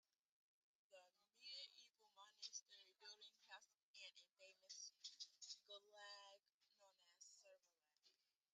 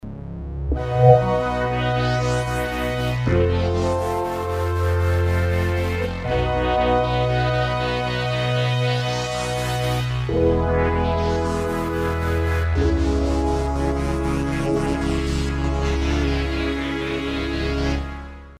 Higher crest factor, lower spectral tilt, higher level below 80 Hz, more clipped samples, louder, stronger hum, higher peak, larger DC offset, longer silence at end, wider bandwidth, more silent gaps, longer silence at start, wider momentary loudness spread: about the same, 24 dB vs 20 dB; second, 4 dB/octave vs -6.5 dB/octave; second, under -90 dBFS vs -28 dBFS; neither; second, -61 LUFS vs -22 LUFS; neither; second, -42 dBFS vs 0 dBFS; neither; first, 0.4 s vs 0 s; second, 9 kHz vs 15.5 kHz; first, 3.82-3.94 s, 6.54-6.60 s vs none; first, 0.9 s vs 0.05 s; first, 12 LU vs 5 LU